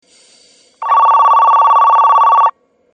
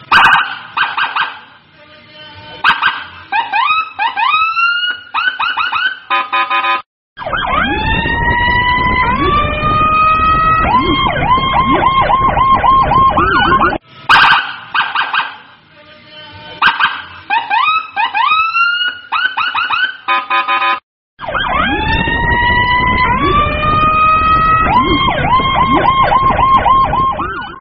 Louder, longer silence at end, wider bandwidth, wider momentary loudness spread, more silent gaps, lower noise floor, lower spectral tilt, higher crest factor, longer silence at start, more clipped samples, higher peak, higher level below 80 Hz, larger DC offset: first, -9 LUFS vs -12 LUFS; first, 0.45 s vs 0 s; first, 8.8 kHz vs 6 kHz; about the same, 6 LU vs 8 LU; second, none vs 6.86-7.16 s, 20.83-21.17 s; first, -48 dBFS vs -41 dBFS; second, 0 dB/octave vs -1.5 dB/octave; about the same, 10 dB vs 12 dB; first, 0.8 s vs 0 s; neither; about the same, 0 dBFS vs 0 dBFS; second, -82 dBFS vs -28 dBFS; neither